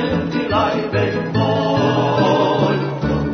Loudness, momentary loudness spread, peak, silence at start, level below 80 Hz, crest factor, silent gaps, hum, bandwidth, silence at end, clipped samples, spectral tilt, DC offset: -17 LUFS; 5 LU; -4 dBFS; 0 s; -40 dBFS; 14 dB; none; none; 6.6 kHz; 0 s; under 0.1%; -7 dB/octave; under 0.1%